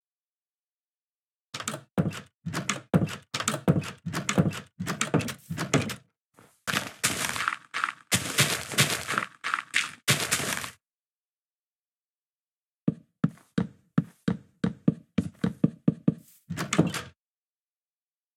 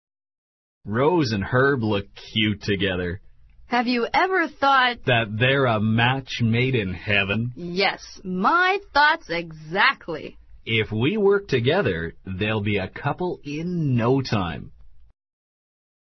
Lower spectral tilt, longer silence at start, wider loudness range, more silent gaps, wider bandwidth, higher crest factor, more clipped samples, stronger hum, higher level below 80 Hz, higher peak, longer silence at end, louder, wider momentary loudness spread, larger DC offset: second, -4 dB/octave vs -6.5 dB/octave; first, 1.55 s vs 0.85 s; first, 7 LU vs 4 LU; first, 2.34-2.38 s, 6.22-6.31 s, 11.00-11.24 s, 11.30-12.87 s vs none; first, over 20 kHz vs 6.2 kHz; first, 26 dB vs 20 dB; neither; neither; second, -60 dBFS vs -50 dBFS; about the same, -6 dBFS vs -4 dBFS; first, 1.25 s vs 1.05 s; second, -29 LUFS vs -22 LUFS; about the same, 11 LU vs 11 LU; neither